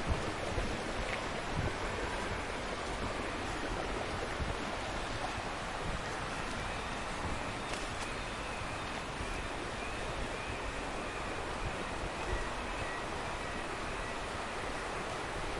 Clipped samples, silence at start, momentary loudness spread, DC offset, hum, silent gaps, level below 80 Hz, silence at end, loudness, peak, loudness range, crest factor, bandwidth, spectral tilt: under 0.1%; 0 s; 2 LU; under 0.1%; none; none; -46 dBFS; 0 s; -38 LUFS; -18 dBFS; 2 LU; 18 dB; 11.5 kHz; -4 dB/octave